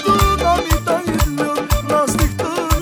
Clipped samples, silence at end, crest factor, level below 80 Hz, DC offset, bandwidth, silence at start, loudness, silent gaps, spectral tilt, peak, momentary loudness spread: under 0.1%; 0 s; 16 dB; -22 dBFS; under 0.1%; over 20 kHz; 0 s; -17 LUFS; none; -5 dB/octave; 0 dBFS; 5 LU